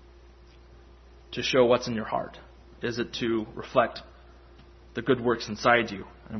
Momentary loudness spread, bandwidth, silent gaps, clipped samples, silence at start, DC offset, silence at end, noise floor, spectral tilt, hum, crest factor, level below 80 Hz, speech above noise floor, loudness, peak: 16 LU; 6.4 kHz; none; under 0.1%; 0.75 s; under 0.1%; 0 s; -52 dBFS; -5 dB/octave; none; 24 dB; -52 dBFS; 25 dB; -27 LUFS; -6 dBFS